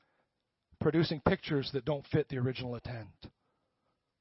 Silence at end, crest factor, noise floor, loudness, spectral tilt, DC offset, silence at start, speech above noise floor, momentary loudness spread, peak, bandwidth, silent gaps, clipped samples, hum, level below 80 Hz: 0.9 s; 24 dB; -83 dBFS; -33 LUFS; -10 dB/octave; under 0.1%; 0.8 s; 50 dB; 13 LU; -12 dBFS; 5.8 kHz; none; under 0.1%; none; -58 dBFS